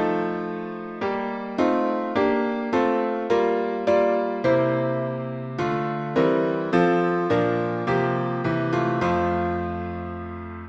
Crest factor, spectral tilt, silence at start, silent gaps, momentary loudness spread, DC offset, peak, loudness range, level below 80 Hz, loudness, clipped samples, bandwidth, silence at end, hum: 16 dB; -8 dB/octave; 0 s; none; 9 LU; under 0.1%; -6 dBFS; 2 LU; -52 dBFS; -24 LUFS; under 0.1%; 7.6 kHz; 0 s; none